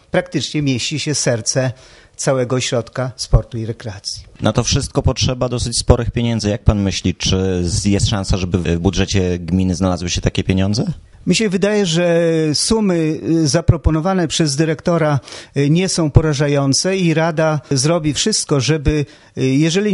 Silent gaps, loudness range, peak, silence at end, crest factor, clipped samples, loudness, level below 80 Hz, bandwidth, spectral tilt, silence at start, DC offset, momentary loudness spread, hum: none; 3 LU; 0 dBFS; 0 s; 16 dB; under 0.1%; -17 LUFS; -28 dBFS; 11.5 kHz; -5 dB/octave; 0.15 s; under 0.1%; 6 LU; none